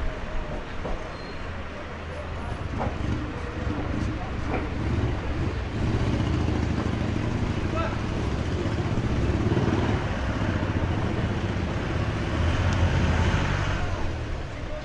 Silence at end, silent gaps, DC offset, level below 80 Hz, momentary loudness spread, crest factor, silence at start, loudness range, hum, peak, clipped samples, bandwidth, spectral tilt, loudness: 0 s; none; under 0.1%; -34 dBFS; 10 LU; 14 dB; 0 s; 6 LU; none; -12 dBFS; under 0.1%; 10.5 kHz; -7 dB/octave; -28 LUFS